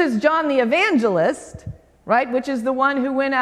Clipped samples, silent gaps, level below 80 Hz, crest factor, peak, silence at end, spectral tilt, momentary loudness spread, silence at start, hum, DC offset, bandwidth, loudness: under 0.1%; none; -52 dBFS; 16 dB; -2 dBFS; 0 s; -5.5 dB/octave; 19 LU; 0 s; none; under 0.1%; 12.5 kHz; -19 LUFS